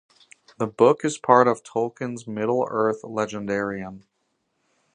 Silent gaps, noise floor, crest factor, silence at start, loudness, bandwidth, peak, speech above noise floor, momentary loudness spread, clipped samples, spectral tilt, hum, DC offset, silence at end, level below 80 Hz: none; -73 dBFS; 22 dB; 0.6 s; -23 LUFS; 10 kHz; -2 dBFS; 51 dB; 13 LU; under 0.1%; -5.5 dB/octave; none; under 0.1%; 0.95 s; -64 dBFS